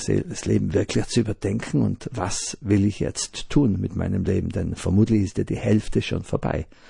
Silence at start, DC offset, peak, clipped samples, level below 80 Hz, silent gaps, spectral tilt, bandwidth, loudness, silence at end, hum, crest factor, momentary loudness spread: 0 s; under 0.1%; -6 dBFS; under 0.1%; -40 dBFS; none; -6 dB/octave; 11 kHz; -24 LUFS; 0.25 s; none; 16 dB; 6 LU